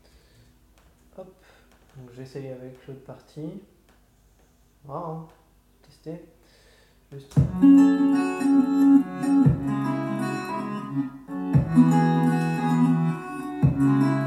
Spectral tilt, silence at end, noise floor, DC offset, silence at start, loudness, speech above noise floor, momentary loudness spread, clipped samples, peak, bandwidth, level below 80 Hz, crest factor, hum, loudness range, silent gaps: -8.5 dB/octave; 0 s; -59 dBFS; under 0.1%; 1.2 s; -22 LUFS; 36 dB; 22 LU; under 0.1%; -6 dBFS; 12 kHz; -48 dBFS; 18 dB; none; 22 LU; none